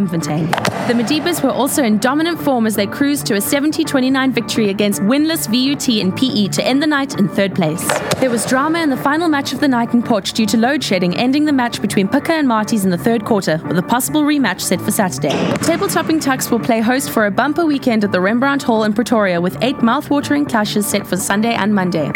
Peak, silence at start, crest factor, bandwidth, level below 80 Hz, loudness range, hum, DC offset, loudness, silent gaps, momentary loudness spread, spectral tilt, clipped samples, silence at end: 0 dBFS; 0 s; 16 dB; 19 kHz; -52 dBFS; 1 LU; none; under 0.1%; -15 LUFS; none; 3 LU; -4.5 dB/octave; under 0.1%; 0 s